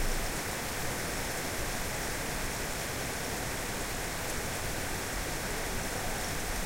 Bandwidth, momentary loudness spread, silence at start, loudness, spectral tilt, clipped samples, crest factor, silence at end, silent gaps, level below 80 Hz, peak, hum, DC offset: 16 kHz; 1 LU; 0 s; -34 LUFS; -3 dB/octave; under 0.1%; 14 dB; 0 s; none; -40 dBFS; -20 dBFS; none; under 0.1%